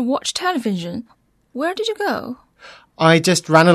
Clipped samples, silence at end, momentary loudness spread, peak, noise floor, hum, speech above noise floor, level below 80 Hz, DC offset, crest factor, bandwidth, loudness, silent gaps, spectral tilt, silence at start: under 0.1%; 0 s; 19 LU; 0 dBFS; -45 dBFS; none; 28 dB; -60 dBFS; under 0.1%; 18 dB; 13.5 kHz; -18 LUFS; none; -4.5 dB/octave; 0 s